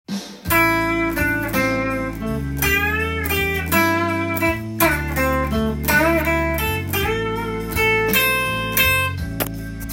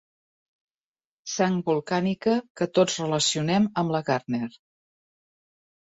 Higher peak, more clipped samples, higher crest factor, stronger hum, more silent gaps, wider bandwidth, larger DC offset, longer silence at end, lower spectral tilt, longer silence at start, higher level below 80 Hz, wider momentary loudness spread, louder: first, -2 dBFS vs -8 dBFS; neither; about the same, 18 dB vs 20 dB; neither; second, none vs 2.50-2.55 s; first, 17 kHz vs 8.2 kHz; neither; second, 0 s vs 1.45 s; about the same, -4.5 dB/octave vs -4.5 dB/octave; second, 0.1 s vs 1.25 s; first, -34 dBFS vs -66 dBFS; about the same, 9 LU vs 8 LU; first, -19 LUFS vs -25 LUFS